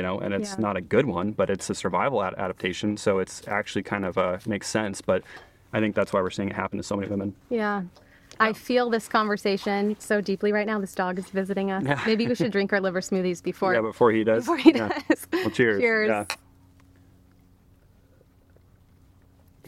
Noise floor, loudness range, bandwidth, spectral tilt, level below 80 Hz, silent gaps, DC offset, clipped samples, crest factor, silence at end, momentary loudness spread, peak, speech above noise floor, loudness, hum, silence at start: -57 dBFS; 5 LU; 15 kHz; -5.5 dB/octave; -60 dBFS; none; under 0.1%; under 0.1%; 24 dB; 0 s; 8 LU; -2 dBFS; 33 dB; -25 LUFS; none; 0 s